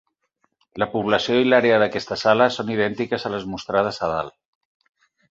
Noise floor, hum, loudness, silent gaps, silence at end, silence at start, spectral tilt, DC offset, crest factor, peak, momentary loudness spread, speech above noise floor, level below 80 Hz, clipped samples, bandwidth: -70 dBFS; none; -21 LUFS; none; 1.05 s; 0.75 s; -5.5 dB/octave; under 0.1%; 20 dB; -2 dBFS; 11 LU; 50 dB; -56 dBFS; under 0.1%; 7.8 kHz